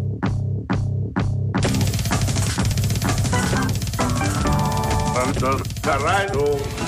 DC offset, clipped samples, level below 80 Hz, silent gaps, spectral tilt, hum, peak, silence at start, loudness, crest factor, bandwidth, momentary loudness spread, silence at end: under 0.1%; under 0.1%; -32 dBFS; none; -5 dB/octave; none; -10 dBFS; 0 s; -21 LUFS; 12 dB; 15.5 kHz; 4 LU; 0 s